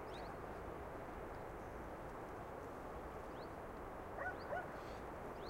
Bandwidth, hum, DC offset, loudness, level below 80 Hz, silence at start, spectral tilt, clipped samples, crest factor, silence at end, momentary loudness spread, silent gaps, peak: 16 kHz; none; under 0.1%; -49 LUFS; -60 dBFS; 0 s; -6 dB/octave; under 0.1%; 16 dB; 0 s; 4 LU; none; -32 dBFS